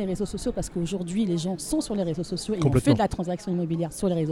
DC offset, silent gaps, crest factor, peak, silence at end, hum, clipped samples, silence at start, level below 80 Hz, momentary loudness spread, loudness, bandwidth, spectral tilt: under 0.1%; none; 20 dB; -6 dBFS; 0 s; none; under 0.1%; 0 s; -44 dBFS; 8 LU; -26 LUFS; 15 kHz; -6.5 dB/octave